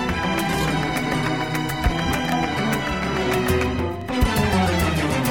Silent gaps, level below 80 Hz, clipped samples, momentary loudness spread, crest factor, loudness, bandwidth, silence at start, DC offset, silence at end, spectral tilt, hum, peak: none; -32 dBFS; under 0.1%; 4 LU; 14 dB; -22 LUFS; 17.5 kHz; 0 s; 0.5%; 0 s; -5 dB/octave; none; -6 dBFS